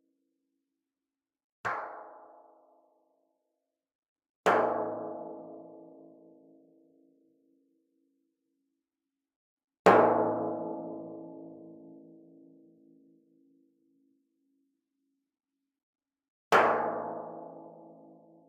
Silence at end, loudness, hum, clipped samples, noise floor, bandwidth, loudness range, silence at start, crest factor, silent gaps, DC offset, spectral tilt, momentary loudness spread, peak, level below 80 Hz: 0.65 s; -28 LUFS; none; under 0.1%; under -90 dBFS; 8.4 kHz; 15 LU; 1.65 s; 28 dB; 3.95-4.02 s, 4.08-4.16 s, 4.29-4.44 s, 9.36-9.57 s, 9.79-9.85 s, 15.83-15.93 s, 16.30-16.51 s; under 0.1%; -5.5 dB/octave; 27 LU; -6 dBFS; -80 dBFS